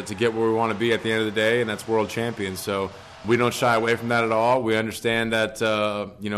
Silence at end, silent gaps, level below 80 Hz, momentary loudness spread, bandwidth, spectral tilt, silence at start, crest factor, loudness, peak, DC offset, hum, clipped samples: 0 s; none; -56 dBFS; 7 LU; 13.5 kHz; -5 dB/octave; 0 s; 14 dB; -23 LUFS; -10 dBFS; under 0.1%; none; under 0.1%